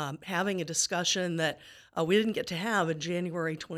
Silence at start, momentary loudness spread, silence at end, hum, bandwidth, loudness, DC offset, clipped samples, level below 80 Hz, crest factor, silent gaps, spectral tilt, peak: 0 s; 7 LU; 0 s; none; 16 kHz; -30 LUFS; under 0.1%; under 0.1%; -70 dBFS; 18 dB; none; -3.5 dB/octave; -12 dBFS